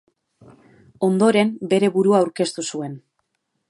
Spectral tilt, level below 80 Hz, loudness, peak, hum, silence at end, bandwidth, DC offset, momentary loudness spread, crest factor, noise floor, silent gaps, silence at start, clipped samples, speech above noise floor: -5.5 dB/octave; -70 dBFS; -19 LUFS; -4 dBFS; none; 0.7 s; 11.5 kHz; under 0.1%; 14 LU; 18 dB; -73 dBFS; none; 1 s; under 0.1%; 54 dB